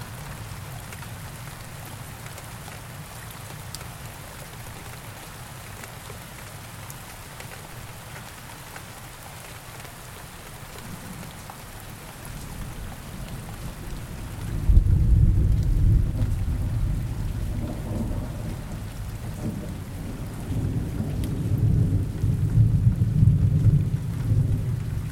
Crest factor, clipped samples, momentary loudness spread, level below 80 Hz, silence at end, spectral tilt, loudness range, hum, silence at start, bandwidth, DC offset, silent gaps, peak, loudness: 22 dB; under 0.1%; 18 LU; -30 dBFS; 0 s; -6.5 dB/octave; 16 LU; none; 0 s; 17 kHz; under 0.1%; none; -4 dBFS; -27 LUFS